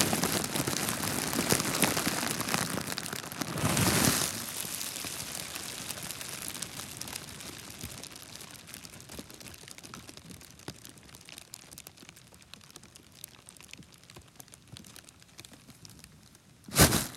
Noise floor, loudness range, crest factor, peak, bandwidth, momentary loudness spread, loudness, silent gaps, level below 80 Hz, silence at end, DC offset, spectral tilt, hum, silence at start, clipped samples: -57 dBFS; 20 LU; 34 dB; -2 dBFS; 17 kHz; 24 LU; -30 LUFS; none; -52 dBFS; 0 s; under 0.1%; -3 dB/octave; none; 0 s; under 0.1%